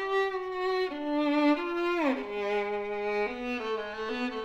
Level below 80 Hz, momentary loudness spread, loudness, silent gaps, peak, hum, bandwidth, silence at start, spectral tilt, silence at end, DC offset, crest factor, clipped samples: -62 dBFS; 7 LU; -30 LUFS; none; -16 dBFS; none; 8.2 kHz; 0 s; -5 dB/octave; 0 s; under 0.1%; 14 dB; under 0.1%